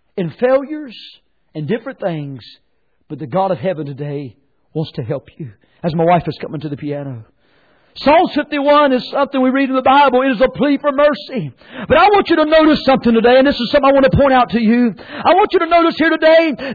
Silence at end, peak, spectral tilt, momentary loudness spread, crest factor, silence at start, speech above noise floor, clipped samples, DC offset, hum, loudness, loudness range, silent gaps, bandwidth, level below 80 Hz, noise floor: 0 s; -2 dBFS; -8 dB/octave; 17 LU; 12 dB; 0.15 s; 41 dB; under 0.1%; under 0.1%; none; -14 LUFS; 11 LU; none; 4.9 kHz; -42 dBFS; -55 dBFS